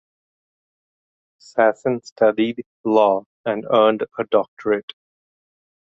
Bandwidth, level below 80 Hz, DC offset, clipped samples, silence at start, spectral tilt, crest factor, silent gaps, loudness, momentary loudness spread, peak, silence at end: 7.8 kHz; -68 dBFS; under 0.1%; under 0.1%; 1.55 s; -6 dB/octave; 20 dB; 2.12-2.16 s, 2.66-2.84 s, 3.26-3.44 s, 4.48-4.57 s; -20 LUFS; 10 LU; -2 dBFS; 1.15 s